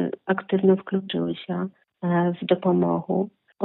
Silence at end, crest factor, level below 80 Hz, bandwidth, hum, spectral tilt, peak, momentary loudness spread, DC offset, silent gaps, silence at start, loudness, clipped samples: 0 s; 18 dB; -70 dBFS; 4.1 kHz; none; -6.5 dB/octave; -6 dBFS; 10 LU; under 0.1%; none; 0 s; -24 LUFS; under 0.1%